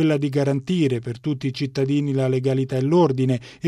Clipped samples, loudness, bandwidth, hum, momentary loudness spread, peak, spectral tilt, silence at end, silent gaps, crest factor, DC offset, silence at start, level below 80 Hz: under 0.1%; -22 LUFS; 10.5 kHz; none; 7 LU; -6 dBFS; -8 dB/octave; 0 s; none; 14 dB; under 0.1%; 0 s; -60 dBFS